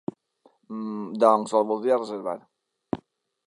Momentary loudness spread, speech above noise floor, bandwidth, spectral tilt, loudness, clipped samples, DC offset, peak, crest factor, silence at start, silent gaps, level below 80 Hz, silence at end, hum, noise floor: 17 LU; 39 dB; 11.5 kHz; -6 dB/octave; -25 LUFS; under 0.1%; under 0.1%; -4 dBFS; 22 dB; 0.7 s; none; -66 dBFS; 0.5 s; none; -63 dBFS